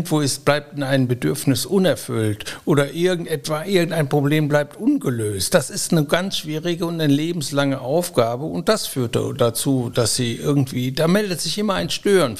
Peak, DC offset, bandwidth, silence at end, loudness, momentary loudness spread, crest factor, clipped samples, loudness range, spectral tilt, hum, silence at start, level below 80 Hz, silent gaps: -2 dBFS; 0.7%; 15.5 kHz; 0 s; -20 LUFS; 5 LU; 18 dB; under 0.1%; 1 LU; -5 dB/octave; none; 0 s; -52 dBFS; none